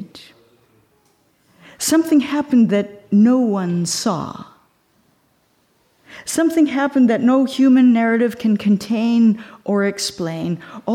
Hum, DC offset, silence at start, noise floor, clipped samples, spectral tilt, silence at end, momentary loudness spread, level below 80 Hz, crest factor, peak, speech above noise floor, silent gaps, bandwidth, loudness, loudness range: none; under 0.1%; 0 s; -61 dBFS; under 0.1%; -5 dB/octave; 0 s; 11 LU; -62 dBFS; 12 dB; -6 dBFS; 45 dB; none; 16 kHz; -17 LUFS; 6 LU